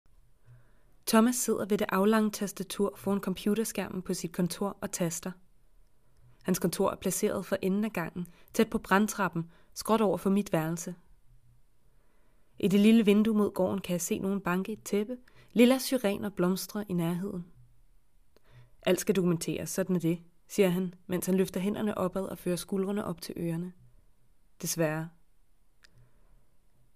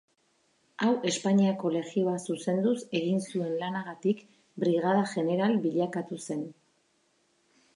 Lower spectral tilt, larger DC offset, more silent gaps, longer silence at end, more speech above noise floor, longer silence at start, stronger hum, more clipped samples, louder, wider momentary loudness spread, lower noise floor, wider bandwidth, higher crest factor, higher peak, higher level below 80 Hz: about the same, -5.5 dB/octave vs -6 dB/octave; first, 0.1% vs under 0.1%; neither; first, 1.85 s vs 1.25 s; second, 37 dB vs 42 dB; second, 0.5 s vs 0.8 s; neither; neither; about the same, -30 LUFS vs -29 LUFS; first, 13 LU vs 10 LU; second, -66 dBFS vs -71 dBFS; first, 15.5 kHz vs 11 kHz; first, 22 dB vs 16 dB; first, -8 dBFS vs -14 dBFS; first, -62 dBFS vs -80 dBFS